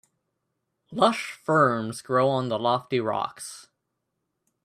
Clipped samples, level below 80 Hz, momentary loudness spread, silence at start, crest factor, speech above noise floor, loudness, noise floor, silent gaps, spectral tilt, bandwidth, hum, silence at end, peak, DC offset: under 0.1%; -70 dBFS; 17 LU; 0.9 s; 22 dB; 55 dB; -25 LUFS; -80 dBFS; none; -5 dB/octave; 14.5 kHz; none; 1 s; -6 dBFS; under 0.1%